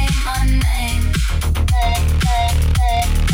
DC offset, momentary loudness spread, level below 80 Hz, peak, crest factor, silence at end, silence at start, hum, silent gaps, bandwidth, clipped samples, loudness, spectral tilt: under 0.1%; 2 LU; -16 dBFS; -6 dBFS; 10 dB; 0 s; 0 s; none; none; 16.5 kHz; under 0.1%; -18 LUFS; -5 dB/octave